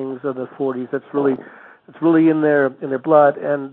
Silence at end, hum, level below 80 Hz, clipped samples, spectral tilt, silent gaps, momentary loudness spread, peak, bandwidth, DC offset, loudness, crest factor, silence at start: 0 s; none; -72 dBFS; under 0.1%; -10.5 dB/octave; none; 12 LU; -2 dBFS; 4 kHz; under 0.1%; -18 LUFS; 16 dB; 0 s